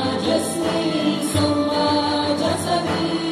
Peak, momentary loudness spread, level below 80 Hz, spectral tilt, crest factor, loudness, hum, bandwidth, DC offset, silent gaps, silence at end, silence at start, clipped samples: -6 dBFS; 3 LU; -52 dBFS; -4.5 dB/octave; 14 dB; -20 LUFS; none; 15 kHz; under 0.1%; none; 0 s; 0 s; under 0.1%